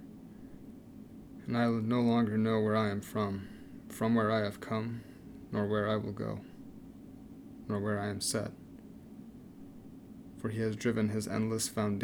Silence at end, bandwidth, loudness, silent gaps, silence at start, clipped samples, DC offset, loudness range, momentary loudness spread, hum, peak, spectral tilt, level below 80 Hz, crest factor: 0 s; 19 kHz; -33 LUFS; none; 0 s; under 0.1%; under 0.1%; 7 LU; 22 LU; none; -18 dBFS; -5.5 dB/octave; -64 dBFS; 16 dB